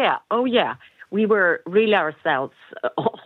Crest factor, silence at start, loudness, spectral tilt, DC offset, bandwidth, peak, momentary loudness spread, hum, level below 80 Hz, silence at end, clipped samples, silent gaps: 16 dB; 0 s; -21 LUFS; -7.5 dB/octave; under 0.1%; 4.4 kHz; -6 dBFS; 11 LU; none; -74 dBFS; 0.05 s; under 0.1%; none